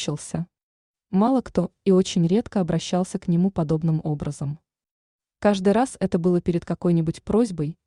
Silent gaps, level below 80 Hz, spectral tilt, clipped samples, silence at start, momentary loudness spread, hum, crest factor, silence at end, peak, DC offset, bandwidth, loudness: 0.63-0.94 s, 4.91-5.19 s; -50 dBFS; -7 dB/octave; under 0.1%; 0 s; 9 LU; none; 16 dB; 0.15 s; -8 dBFS; under 0.1%; 11 kHz; -23 LUFS